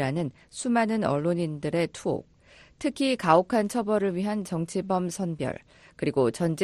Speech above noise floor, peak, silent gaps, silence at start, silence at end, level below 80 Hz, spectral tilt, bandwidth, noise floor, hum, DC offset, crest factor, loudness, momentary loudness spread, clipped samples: 28 dB; -6 dBFS; none; 0 s; 0 s; -60 dBFS; -6 dB/octave; 13 kHz; -54 dBFS; none; under 0.1%; 20 dB; -27 LUFS; 11 LU; under 0.1%